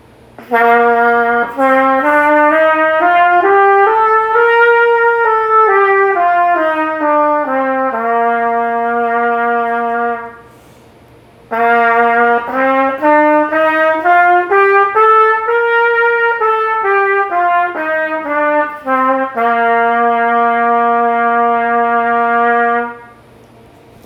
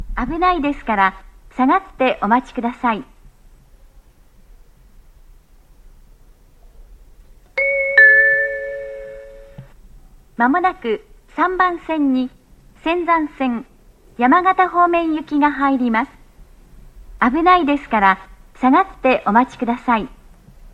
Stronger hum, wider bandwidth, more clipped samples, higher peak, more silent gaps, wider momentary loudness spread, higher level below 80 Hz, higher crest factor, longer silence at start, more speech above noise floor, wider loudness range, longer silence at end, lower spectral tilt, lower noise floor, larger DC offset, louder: neither; first, 13.5 kHz vs 9 kHz; neither; about the same, 0 dBFS vs 0 dBFS; neither; second, 6 LU vs 13 LU; second, -56 dBFS vs -42 dBFS; second, 12 dB vs 18 dB; first, 0.4 s vs 0 s; about the same, 31 dB vs 31 dB; about the same, 5 LU vs 7 LU; first, 1 s vs 0.65 s; about the same, -5.5 dB/octave vs -6.5 dB/octave; second, -42 dBFS vs -48 dBFS; neither; first, -11 LUFS vs -16 LUFS